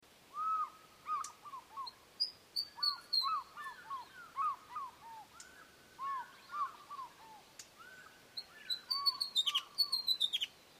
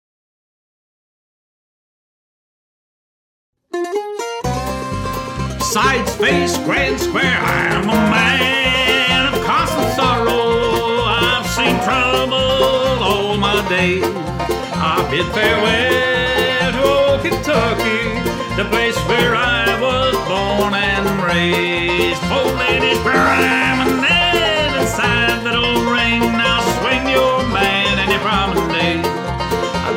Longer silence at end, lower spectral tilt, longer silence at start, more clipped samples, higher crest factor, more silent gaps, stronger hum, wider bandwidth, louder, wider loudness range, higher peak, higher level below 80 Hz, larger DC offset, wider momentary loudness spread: about the same, 0 s vs 0 s; second, 1 dB/octave vs -4 dB/octave; second, 0.3 s vs 3.75 s; neither; about the same, 20 dB vs 16 dB; neither; neither; about the same, 15.5 kHz vs 17 kHz; second, -37 LUFS vs -15 LUFS; first, 11 LU vs 5 LU; second, -22 dBFS vs -2 dBFS; second, -82 dBFS vs -34 dBFS; neither; first, 22 LU vs 7 LU